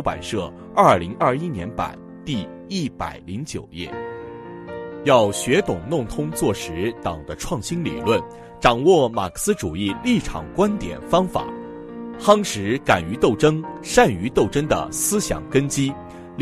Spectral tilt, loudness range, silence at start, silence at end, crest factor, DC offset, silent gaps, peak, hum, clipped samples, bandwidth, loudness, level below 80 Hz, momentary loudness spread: -5 dB/octave; 5 LU; 0 s; 0 s; 20 dB; under 0.1%; none; 0 dBFS; none; under 0.1%; 13.5 kHz; -21 LUFS; -42 dBFS; 15 LU